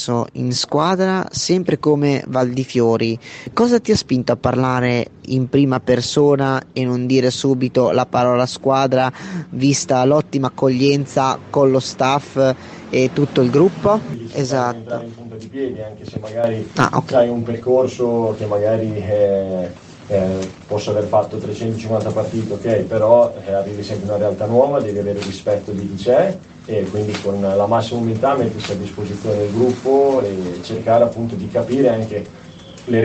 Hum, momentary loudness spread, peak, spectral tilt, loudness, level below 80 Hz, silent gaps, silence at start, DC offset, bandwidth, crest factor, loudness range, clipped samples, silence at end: none; 10 LU; 0 dBFS; -6 dB/octave; -18 LUFS; -50 dBFS; none; 0 s; under 0.1%; 8.8 kHz; 18 dB; 3 LU; under 0.1%; 0 s